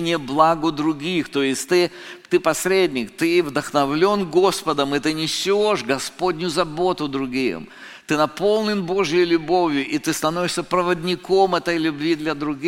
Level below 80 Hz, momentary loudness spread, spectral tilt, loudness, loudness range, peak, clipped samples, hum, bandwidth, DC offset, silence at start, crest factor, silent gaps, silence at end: -52 dBFS; 6 LU; -4.5 dB/octave; -20 LUFS; 2 LU; -2 dBFS; under 0.1%; none; 16.5 kHz; under 0.1%; 0 s; 18 dB; none; 0 s